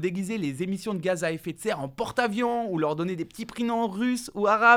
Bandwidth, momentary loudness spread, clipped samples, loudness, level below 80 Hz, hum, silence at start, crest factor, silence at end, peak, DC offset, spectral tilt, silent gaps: 17 kHz; 6 LU; under 0.1%; -28 LUFS; -62 dBFS; none; 0 s; 20 dB; 0 s; -6 dBFS; under 0.1%; -5.5 dB/octave; none